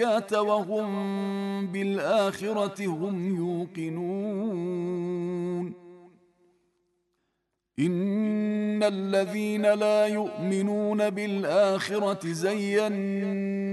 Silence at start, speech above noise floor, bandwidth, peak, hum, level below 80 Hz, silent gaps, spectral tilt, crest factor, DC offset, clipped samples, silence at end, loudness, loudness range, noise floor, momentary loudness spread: 0 s; 53 dB; 12.5 kHz; -12 dBFS; none; -76 dBFS; none; -6.5 dB/octave; 16 dB; under 0.1%; under 0.1%; 0 s; -27 LUFS; 8 LU; -79 dBFS; 7 LU